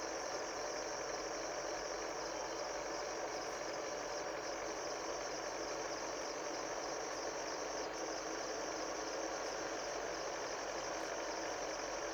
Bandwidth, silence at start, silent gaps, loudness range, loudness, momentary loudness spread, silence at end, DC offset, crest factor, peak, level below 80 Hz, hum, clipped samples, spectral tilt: over 20 kHz; 0 s; none; 1 LU; -42 LUFS; 1 LU; 0 s; under 0.1%; 14 dB; -28 dBFS; -66 dBFS; none; under 0.1%; -1.5 dB/octave